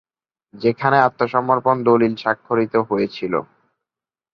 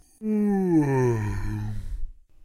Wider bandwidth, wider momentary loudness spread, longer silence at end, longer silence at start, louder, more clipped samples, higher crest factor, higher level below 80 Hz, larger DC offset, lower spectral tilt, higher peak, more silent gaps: second, 6.4 kHz vs 13.5 kHz; second, 7 LU vs 16 LU; first, 0.9 s vs 0 s; first, 0.55 s vs 0.2 s; first, -19 LUFS vs -25 LUFS; neither; about the same, 18 dB vs 14 dB; second, -60 dBFS vs -36 dBFS; neither; about the same, -8.5 dB/octave vs -9 dB/octave; first, -2 dBFS vs -12 dBFS; neither